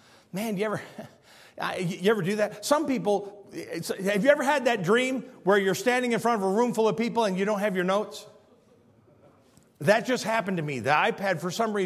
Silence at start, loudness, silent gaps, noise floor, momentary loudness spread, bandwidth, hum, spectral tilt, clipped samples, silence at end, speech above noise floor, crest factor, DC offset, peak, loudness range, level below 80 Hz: 0.35 s; -26 LUFS; none; -59 dBFS; 11 LU; 15.5 kHz; none; -5 dB/octave; under 0.1%; 0 s; 33 dB; 22 dB; under 0.1%; -6 dBFS; 4 LU; -72 dBFS